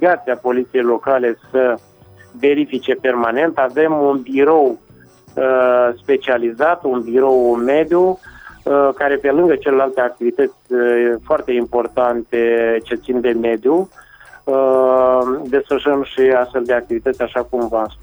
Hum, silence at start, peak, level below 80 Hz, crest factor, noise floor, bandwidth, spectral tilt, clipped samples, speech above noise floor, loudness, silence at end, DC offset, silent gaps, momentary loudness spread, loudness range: none; 0 s; -2 dBFS; -50 dBFS; 14 dB; -45 dBFS; over 20 kHz; -7 dB/octave; under 0.1%; 30 dB; -16 LUFS; 0.05 s; under 0.1%; none; 6 LU; 2 LU